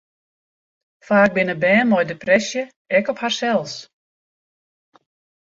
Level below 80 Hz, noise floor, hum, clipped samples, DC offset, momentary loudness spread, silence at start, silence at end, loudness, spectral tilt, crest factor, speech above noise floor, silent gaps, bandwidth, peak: -62 dBFS; under -90 dBFS; none; under 0.1%; under 0.1%; 11 LU; 1.1 s; 1.6 s; -18 LUFS; -4.5 dB/octave; 18 dB; over 72 dB; 2.76-2.85 s; 7.8 kHz; -2 dBFS